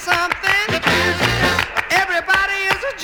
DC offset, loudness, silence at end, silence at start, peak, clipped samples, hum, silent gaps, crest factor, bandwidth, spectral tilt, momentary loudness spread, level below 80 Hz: under 0.1%; -16 LUFS; 0 s; 0 s; -2 dBFS; under 0.1%; none; none; 16 dB; over 20 kHz; -3 dB/octave; 2 LU; -40 dBFS